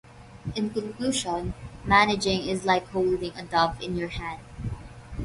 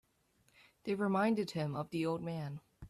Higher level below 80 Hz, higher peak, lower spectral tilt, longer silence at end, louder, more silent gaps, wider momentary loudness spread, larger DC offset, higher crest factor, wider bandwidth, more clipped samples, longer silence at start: first, -44 dBFS vs -70 dBFS; first, -6 dBFS vs -20 dBFS; second, -4.5 dB/octave vs -7 dB/octave; about the same, 0 s vs 0 s; first, -26 LUFS vs -36 LUFS; neither; first, 16 LU vs 11 LU; neither; about the same, 22 dB vs 18 dB; second, 11.5 kHz vs 13.5 kHz; neither; second, 0.05 s vs 0.85 s